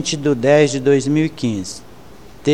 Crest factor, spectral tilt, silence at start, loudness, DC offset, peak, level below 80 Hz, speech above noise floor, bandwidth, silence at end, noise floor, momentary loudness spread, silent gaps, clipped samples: 16 dB; -5.5 dB/octave; 0 s; -16 LUFS; 0.9%; -2 dBFS; -50 dBFS; 25 dB; 12.5 kHz; 0 s; -41 dBFS; 14 LU; none; under 0.1%